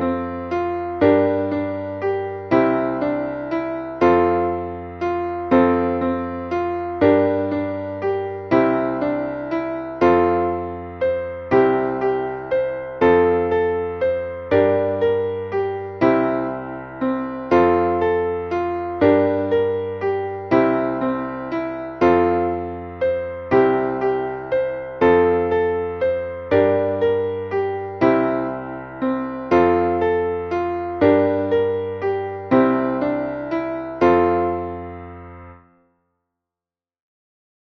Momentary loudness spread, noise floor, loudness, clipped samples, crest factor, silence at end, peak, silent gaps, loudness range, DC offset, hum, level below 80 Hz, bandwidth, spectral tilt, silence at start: 10 LU; under -90 dBFS; -20 LUFS; under 0.1%; 18 dB; 2.05 s; -2 dBFS; none; 1 LU; under 0.1%; none; -48 dBFS; 6.2 kHz; -8.5 dB/octave; 0 s